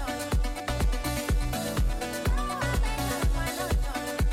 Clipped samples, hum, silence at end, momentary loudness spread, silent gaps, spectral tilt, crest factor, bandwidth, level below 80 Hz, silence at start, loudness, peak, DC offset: under 0.1%; none; 0 s; 2 LU; none; -4.5 dB/octave; 12 dB; 16.5 kHz; -30 dBFS; 0 s; -29 LUFS; -16 dBFS; under 0.1%